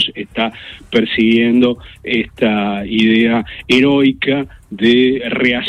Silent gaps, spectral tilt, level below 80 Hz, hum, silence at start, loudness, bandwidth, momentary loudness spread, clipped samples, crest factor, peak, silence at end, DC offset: none; -6 dB/octave; -44 dBFS; none; 0 s; -14 LUFS; 9 kHz; 9 LU; under 0.1%; 14 dB; 0 dBFS; 0 s; under 0.1%